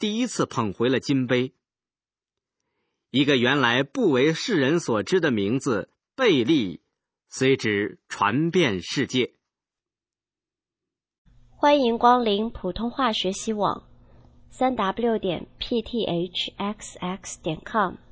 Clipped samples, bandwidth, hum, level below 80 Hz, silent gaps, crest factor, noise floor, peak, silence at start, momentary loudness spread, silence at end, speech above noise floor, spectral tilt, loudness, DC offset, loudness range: under 0.1%; 8 kHz; none; -54 dBFS; 11.18-11.25 s; 20 dB; under -90 dBFS; -4 dBFS; 0 s; 12 LU; 0.15 s; over 67 dB; -5 dB/octave; -24 LUFS; under 0.1%; 5 LU